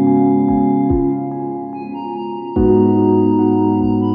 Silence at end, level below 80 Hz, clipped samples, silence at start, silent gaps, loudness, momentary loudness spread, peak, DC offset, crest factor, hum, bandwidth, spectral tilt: 0 s; -34 dBFS; under 0.1%; 0 s; none; -15 LUFS; 12 LU; -2 dBFS; under 0.1%; 12 dB; none; 4.9 kHz; -13 dB/octave